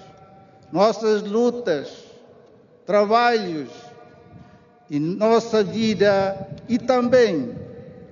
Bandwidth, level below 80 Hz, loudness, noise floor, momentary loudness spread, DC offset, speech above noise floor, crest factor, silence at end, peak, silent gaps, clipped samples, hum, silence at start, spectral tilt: 7.4 kHz; -62 dBFS; -20 LUFS; -51 dBFS; 17 LU; under 0.1%; 31 dB; 18 dB; 0.05 s; -4 dBFS; none; under 0.1%; none; 0 s; -4.5 dB/octave